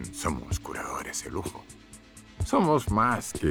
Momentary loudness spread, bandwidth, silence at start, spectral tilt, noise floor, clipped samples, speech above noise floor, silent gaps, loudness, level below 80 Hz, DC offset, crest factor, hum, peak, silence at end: 24 LU; 19.5 kHz; 0 s; -5 dB/octave; -50 dBFS; under 0.1%; 22 dB; none; -28 LUFS; -42 dBFS; under 0.1%; 18 dB; none; -10 dBFS; 0 s